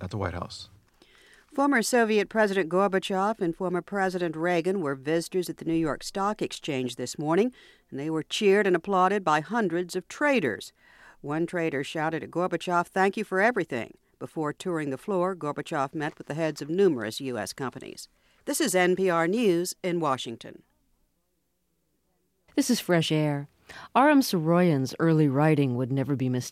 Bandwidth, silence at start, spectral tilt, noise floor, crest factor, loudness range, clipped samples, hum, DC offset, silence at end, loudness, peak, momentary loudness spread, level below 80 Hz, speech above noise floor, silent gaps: 16 kHz; 0 s; -5.5 dB/octave; -76 dBFS; 18 dB; 6 LU; under 0.1%; none; under 0.1%; 0 s; -26 LUFS; -8 dBFS; 12 LU; -62 dBFS; 50 dB; none